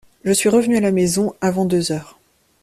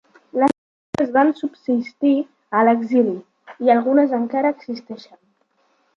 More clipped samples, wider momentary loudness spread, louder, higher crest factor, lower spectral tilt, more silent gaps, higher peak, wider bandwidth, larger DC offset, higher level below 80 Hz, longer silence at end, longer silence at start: neither; second, 5 LU vs 15 LU; about the same, -18 LUFS vs -19 LUFS; about the same, 14 dB vs 18 dB; second, -5 dB/octave vs -7 dB/octave; second, none vs 0.58-0.93 s; about the same, -4 dBFS vs -2 dBFS; first, 15 kHz vs 7.6 kHz; neither; first, -54 dBFS vs -66 dBFS; second, 0.6 s vs 0.95 s; about the same, 0.25 s vs 0.35 s